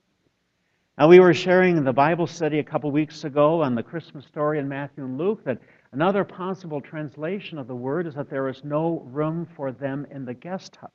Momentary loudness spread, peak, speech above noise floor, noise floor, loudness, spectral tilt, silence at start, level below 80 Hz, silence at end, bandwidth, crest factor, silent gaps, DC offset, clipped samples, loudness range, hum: 16 LU; 0 dBFS; 49 dB; -71 dBFS; -22 LUFS; -7.5 dB/octave; 1 s; -66 dBFS; 0.1 s; 7.4 kHz; 22 dB; none; under 0.1%; under 0.1%; 10 LU; none